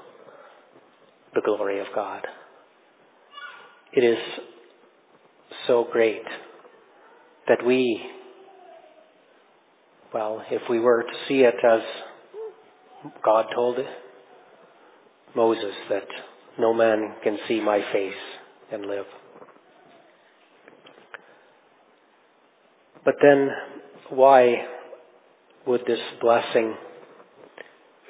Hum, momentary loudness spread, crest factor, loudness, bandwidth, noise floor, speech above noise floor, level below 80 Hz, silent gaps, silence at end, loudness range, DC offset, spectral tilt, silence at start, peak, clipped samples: none; 23 LU; 24 dB; -23 LUFS; 4 kHz; -60 dBFS; 38 dB; -82 dBFS; none; 1.1 s; 10 LU; under 0.1%; -9 dB/octave; 1.35 s; -2 dBFS; under 0.1%